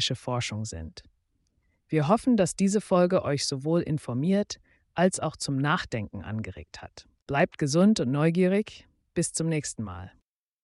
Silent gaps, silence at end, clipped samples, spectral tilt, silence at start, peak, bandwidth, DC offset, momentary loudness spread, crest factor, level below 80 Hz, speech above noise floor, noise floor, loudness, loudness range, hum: 7.22-7.26 s; 0.55 s; under 0.1%; -5.5 dB/octave; 0 s; -10 dBFS; 11.5 kHz; under 0.1%; 16 LU; 18 dB; -56 dBFS; 46 dB; -72 dBFS; -27 LUFS; 4 LU; none